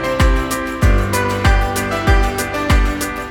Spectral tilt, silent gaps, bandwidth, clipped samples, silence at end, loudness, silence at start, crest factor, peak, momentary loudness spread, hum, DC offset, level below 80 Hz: -5 dB/octave; none; 17.5 kHz; under 0.1%; 0 s; -17 LUFS; 0 s; 14 dB; 0 dBFS; 4 LU; none; under 0.1%; -18 dBFS